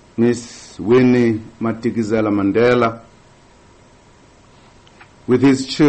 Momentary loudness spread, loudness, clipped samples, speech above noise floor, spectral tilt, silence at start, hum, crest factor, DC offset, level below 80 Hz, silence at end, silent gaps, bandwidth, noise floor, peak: 13 LU; -16 LUFS; under 0.1%; 33 dB; -6.5 dB/octave; 0.15 s; none; 14 dB; under 0.1%; -52 dBFS; 0 s; none; 8.8 kHz; -48 dBFS; -4 dBFS